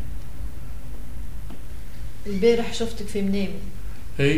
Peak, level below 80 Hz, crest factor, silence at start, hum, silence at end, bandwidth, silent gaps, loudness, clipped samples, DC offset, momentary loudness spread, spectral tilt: -6 dBFS; -36 dBFS; 20 dB; 0 s; none; 0 s; 16 kHz; none; -26 LUFS; under 0.1%; 7%; 19 LU; -6 dB/octave